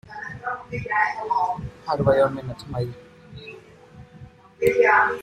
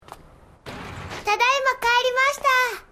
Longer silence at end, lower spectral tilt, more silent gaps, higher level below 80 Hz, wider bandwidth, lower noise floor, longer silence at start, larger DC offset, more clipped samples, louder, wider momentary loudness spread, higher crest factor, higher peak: about the same, 0 s vs 0.1 s; first, -6.5 dB/octave vs -1.5 dB/octave; neither; about the same, -50 dBFS vs -52 dBFS; about the same, 15.5 kHz vs 15.5 kHz; about the same, -46 dBFS vs -49 dBFS; about the same, 0.1 s vs 0.1 s; neither; neither; second, -23 LUFS vs -20 LUFS; about the same, 19 LU vs 18 LU; about the same, 18 dB vs 18 dB; about the same, -6 dBFS vs -6 dBFS